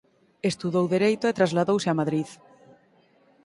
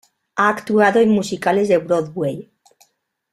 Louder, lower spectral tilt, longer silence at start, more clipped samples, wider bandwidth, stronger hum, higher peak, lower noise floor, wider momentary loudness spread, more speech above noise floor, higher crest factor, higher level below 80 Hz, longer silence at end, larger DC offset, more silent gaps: second, -24 LUFS vs -17 LUFS; about the same, -6 dB/octave vs -6 dB/octave; about the same, 0.45 s vs 0.35 s; neither; second, 11.5 kHz vs 13.5 kHz; neither; second, -8 dBFS vs -2 dBFS; about the same, -61 dBFS vs -63 dBFS; second, 8 LU vs 11 LU; second, 37 dB vs 47 dB; about the same, 18 dB vs 18 dB; second, -68 dBFS vs -58 dBFS; first, 1.1 s vs 0.9 s; neither; neither